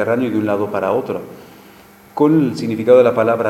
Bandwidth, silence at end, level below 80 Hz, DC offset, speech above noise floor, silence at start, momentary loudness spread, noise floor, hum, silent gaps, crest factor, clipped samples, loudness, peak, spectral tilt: 13.5 kHz; 0 s; -60 dBFS; under 0.1%; 28 dB; 0 s; 15 LU; -43 dBFS; none; none; 16 dB; under 0.1%; -16 LUFS; 0 dBFS; -7.5 dB/octave